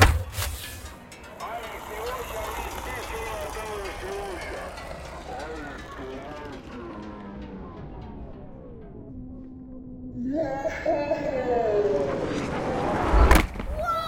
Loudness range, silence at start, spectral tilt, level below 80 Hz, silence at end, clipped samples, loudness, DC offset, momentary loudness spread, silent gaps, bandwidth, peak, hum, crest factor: 15 LU; 0 s; -5.5 dB/octave; -32 dBFS; 0 s; under 0.1%; -29 LUFS; under 0.1%; 18 LU; none; 16.5 kHz; -2 dBFS; none; 26 dB